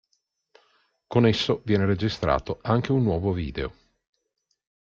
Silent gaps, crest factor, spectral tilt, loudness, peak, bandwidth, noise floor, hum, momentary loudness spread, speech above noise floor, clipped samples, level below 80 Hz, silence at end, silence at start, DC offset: none; 20 dB; -7 dB/octave; -24 LUFS; -6 dBFS; 7.4 kHz; -76 dBFS; none; 8 LU; 53 dB; under 0.1%; -46 dBFS; 1.2 s; 1.1 s; under 0.1%